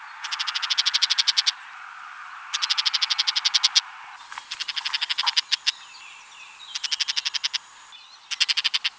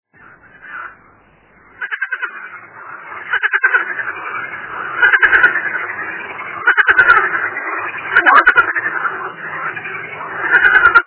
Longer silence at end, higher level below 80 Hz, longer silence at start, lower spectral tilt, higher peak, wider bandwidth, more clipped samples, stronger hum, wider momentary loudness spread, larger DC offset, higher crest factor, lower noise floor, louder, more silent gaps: about the same, 0.05 s vs 0.05 s; second, -80 dBFS vs -52 dBFS; second, 0 s vs 0.6 s; second, 6 dB/octave vs -5.5 dB/octave; about the same, -2 dBFS vs 0 dBFS; first, 8 kHz vs 4 kHz; second, under 0.1% vs 0.2%; neither; about the same, 21 LU vs 21 LU; neither; first, 26 dB vs 16 dB; about the same, -47 dBFS vs -49 dBFS; second, -22 LUFS vs -13 LUFS; neither